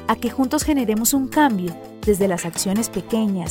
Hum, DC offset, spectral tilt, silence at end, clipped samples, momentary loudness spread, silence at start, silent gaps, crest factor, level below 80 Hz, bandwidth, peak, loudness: none; under 0.1%; -4.5 dB/octave; 0 s; under 0.1%; 5 LU; 0 s; none; 16 dB; -42 dBFS; 17 kHz; -4 dBFS; -20 LUFS